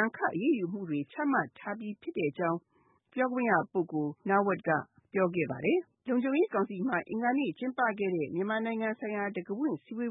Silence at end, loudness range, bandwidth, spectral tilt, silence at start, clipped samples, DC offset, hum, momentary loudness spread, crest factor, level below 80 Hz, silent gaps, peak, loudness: 0 s; 2 LU; 3.9 kHz; -10.5 dB/octave; 0 s; under 0.1%; under 0.1%; none; 7 LU; 18 dB; -78 dBFS; none; -14 dBFS; -32 LUFS